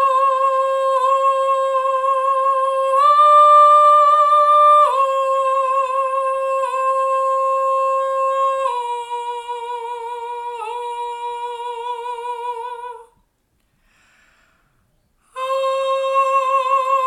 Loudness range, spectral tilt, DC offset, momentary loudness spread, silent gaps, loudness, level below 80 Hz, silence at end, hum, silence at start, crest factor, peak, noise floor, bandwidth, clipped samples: 17 LU; 0.5 dB/octave; under 0.1%; 16 LU; none; -16 LUFS; -66 dBFS; 0 s; none; 0 s; 14 dB; -4 dBFS; -65 dBFS; 12.5 kHz; under 0.1%